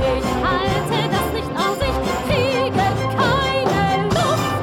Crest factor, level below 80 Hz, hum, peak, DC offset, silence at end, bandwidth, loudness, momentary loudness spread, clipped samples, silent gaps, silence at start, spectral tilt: 14 dB; -34 dBFS; none; -4 dBFS; under 0.1%; 0 s; 18.5 kHz; -19 LUFS; 3 LU; under 0.1%; none; 0 s; -5.5 dB/octave